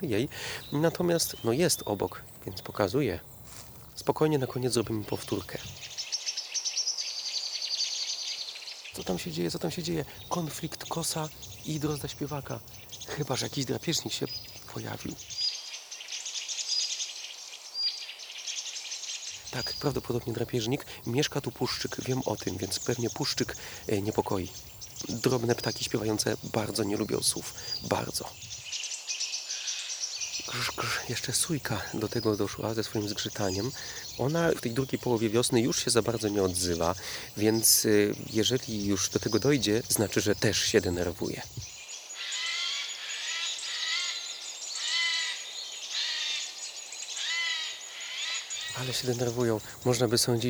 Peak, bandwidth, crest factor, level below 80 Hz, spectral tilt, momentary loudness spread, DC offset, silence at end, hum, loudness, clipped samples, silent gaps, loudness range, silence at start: -8 dBFS; over 20 kHz; 22 dB; -58 dBFS; -3.5 dB/octave; 11 LU; under 0.1%; 0 s; none; -30 LUFS; under 0.1%; none; 7 LU; 0 s